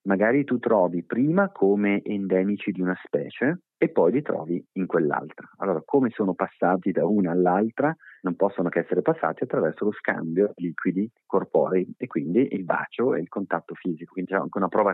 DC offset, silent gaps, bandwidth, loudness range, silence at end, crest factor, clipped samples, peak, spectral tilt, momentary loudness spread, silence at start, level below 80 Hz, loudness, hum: under 0.1%; none; 4 kHz; 2 LU; 0 s; 16 dB; under 0.1%; -8 dBFS; -11 dB/octave; 8 LU; 0.05 s; -80 dBFS; -25 LUFS; none